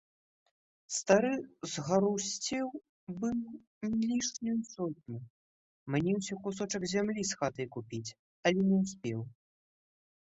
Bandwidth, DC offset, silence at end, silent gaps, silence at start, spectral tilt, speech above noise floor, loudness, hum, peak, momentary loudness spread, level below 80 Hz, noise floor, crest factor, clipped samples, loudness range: 8.2 kHz; under 0.1%; 0.9 s; 2.89-3.07 s, 3.67-3.81 s, 5.30-5.86 s, 8.19-8.43 s; 0.9 s; -4.5 dB/octave; over 57 dB; -33 LUFS; none; -12 dBFS; 16 LU; -68 dBFS; under -90 dBFS; 22 dB; under 0.1%; 3 LU